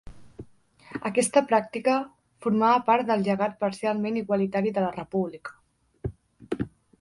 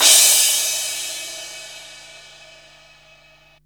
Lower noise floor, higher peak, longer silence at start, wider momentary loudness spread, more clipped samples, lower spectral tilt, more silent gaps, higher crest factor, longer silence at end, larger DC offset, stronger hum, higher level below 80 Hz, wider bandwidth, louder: about the same, -54 dBFS vs -52 dBFS; second, -8 dBFS vs 0 dBFS; about the same, 0.05 s vs 0 s; second, 17 LU vs 27 LU; neither; first, -5.5 dB/octave vs 3.5 dB/octave; neither; about the same, 20 dB vs 20 dB; second, 0.3 s vs 1.55 s; neither; neither; first, -56 dBFS vs -64 dBFS; second, 11.5 kHz vs over 20 kHz; second, -26 LUFS vs -14 LUFS